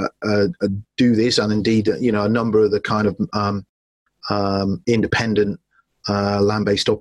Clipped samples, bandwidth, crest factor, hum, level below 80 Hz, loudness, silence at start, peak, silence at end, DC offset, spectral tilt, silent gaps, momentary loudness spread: under 0.1%; 11.5 kHz; 14 dB; none; -50 dBFS; -19 LUFS; 0 s; -6 dBFS; 0 s; under 0.1%; -6 dB/octave; 3.69-4.06 s; 7 LU